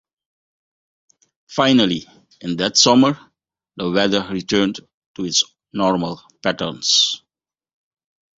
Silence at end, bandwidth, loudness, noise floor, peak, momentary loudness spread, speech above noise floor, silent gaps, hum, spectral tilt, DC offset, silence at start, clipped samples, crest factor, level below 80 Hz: 1.2 s; 8 kHz; -18 LUFS; -85 dBFS; 0 dBFS; 14 LU; 67 dB; 4.94-5.14 s; none; -3 dB/octave; under 0.1%; 1.5 s; under 0.1%; 20 dB; -56 dBFS